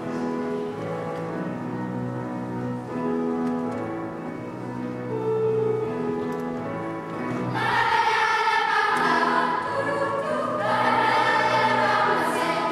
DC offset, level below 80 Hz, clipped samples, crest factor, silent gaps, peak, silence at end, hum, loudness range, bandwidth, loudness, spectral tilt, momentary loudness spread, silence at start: under 0.1%; -60 dBFS; under 0.1%; 16 dB; none; -8 dBFS; 0 s; none; 7 LU; 14 kHz; -24 LUFS; -5.5 dB/octave; 10 LU; 0 s